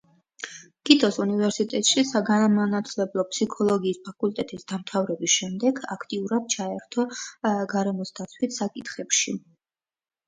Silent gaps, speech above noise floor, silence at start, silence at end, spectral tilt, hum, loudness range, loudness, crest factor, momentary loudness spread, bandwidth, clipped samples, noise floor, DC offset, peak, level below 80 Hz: none; over 65 dB; 0.4 s; 0.9 s; -3.5 dB/octave; none; 5 LU; -24 LUFS; 24 dB; 12 LU; 9.6 kHz; under 0.1%; under -90 dBFS; under 0.1%; 0 dBFS; -70 dBFS